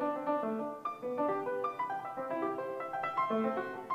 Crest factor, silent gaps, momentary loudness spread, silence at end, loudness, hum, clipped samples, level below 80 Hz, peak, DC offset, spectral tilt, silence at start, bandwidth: 14 dB; none; 6 LU; 0 s; -36 LUFS; none; under 0.1%; -80 dBFS; -20 dBFS; under 0.1%; -7 dB/octave; 0 s; 15.5 kHz